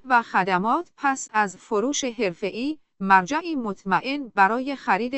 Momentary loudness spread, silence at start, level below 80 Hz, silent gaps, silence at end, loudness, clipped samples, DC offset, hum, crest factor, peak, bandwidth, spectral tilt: 9 LU; 0.05 s; -62 dBFS; none; 0 s; -23 LUFS; under 0.1%; under 0.1%; none; 20 dB; -4 dBFS; 8.4 kHz; -4 dB/octave